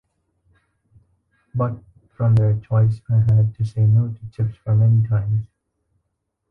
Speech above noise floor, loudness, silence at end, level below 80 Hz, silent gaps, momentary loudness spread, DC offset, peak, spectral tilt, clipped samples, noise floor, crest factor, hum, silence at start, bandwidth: 58 dB; -20 LUFS; 1.05 s; -46 dBFS; none; 10 LU; under 0.1%; -8 dBFS; -11 dB/octave; under 0.1%; -75 dBFS; 12 dB; none; 1.55 s; 2 kHz